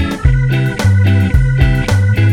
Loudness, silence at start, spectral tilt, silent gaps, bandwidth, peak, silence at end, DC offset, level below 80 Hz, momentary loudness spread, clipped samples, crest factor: -12 LUFS; 0 s; -7 dB/octave; none; 12.5 kHz; 0 dBFS; 0 s; under 0.1%; -18 dBFS; 2 LU; under 0.1%; 10 dB